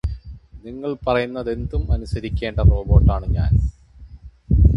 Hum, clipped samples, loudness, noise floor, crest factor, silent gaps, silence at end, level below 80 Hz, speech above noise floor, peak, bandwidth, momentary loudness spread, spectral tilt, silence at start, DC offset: none; under 0.1%; -21 LUFS; -41 dBFS; 18 dB; none; 0 s; -22 dBFS; 23 dB; 0 dBFS; 5.8 kHz; 15 LU; -9 dB/octave; 0.05 s; under 0.1%